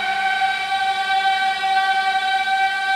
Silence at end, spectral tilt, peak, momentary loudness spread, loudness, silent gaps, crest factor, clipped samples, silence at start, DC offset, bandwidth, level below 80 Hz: 0 s; 0.5 dB/octave; -6 dBFS; 2 LU; -19 LUFS; none; 12 dB; under 0.1%; 0 s; under 0.1%; 15.5 kHz; -64 dBFS